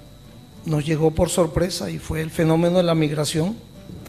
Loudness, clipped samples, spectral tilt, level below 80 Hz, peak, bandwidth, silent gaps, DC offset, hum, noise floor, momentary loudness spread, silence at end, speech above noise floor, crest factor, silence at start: -21 LUFS; under 0.1%; -6 dB/octave; -40 dBFS; -6 dBFS; 14.5 kHz; none; 0.1%; none; -44 dBFS; 9 LU; 0 s; 23 dB; 16 dB; 0 s